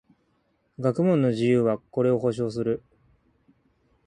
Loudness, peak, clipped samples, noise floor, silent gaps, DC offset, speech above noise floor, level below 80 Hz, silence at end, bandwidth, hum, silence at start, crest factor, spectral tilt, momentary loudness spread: -24 LUFS; -10 dBFS; under 0.1%; -69 dBFS; none; under 0.1%; 46 dB; -62 dBFS; 1.3 s; 10.5 kHz; none; 0.8 s; 16 dB; -8.5 dB/octave; 7 LU